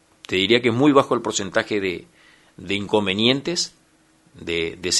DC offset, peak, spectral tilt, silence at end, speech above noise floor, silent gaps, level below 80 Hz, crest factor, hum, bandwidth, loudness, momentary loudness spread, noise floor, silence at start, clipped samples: under 0.1%; 0 dBFS; -3.5 dB/octave; 0 s; 37 dB; none; -56 dBFS; 22 dB; none; 11.5 kHz; -20 LUFS; 11 LU; -58 dBFS; 0.3 s; under 0.1%